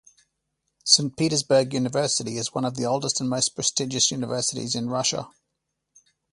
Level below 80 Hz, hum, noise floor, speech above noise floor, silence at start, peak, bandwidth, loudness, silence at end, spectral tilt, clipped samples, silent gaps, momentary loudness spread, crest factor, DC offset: -64 dBFS; none; -80 dBFS; 56 dB; 0.85 s; 0 dBFS; 11.5 kHz; -23 LUFS; 1.05 s; -3 dB/octave; under 0.1%; none; 9 LU; 26 dB; under 0.1%